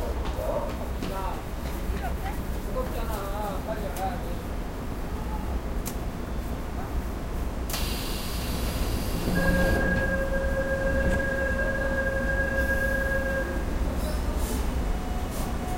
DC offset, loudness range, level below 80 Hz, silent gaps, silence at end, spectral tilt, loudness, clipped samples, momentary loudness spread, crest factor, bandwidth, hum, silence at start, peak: under 0.1%; 7 LU; -30 dBFS; none; 0 s; -5.5 dB/octave; -29 LUFS; under 0.1%; 8 LU; 16 dB; 16 kHz; none; 0 s; -12 dBFS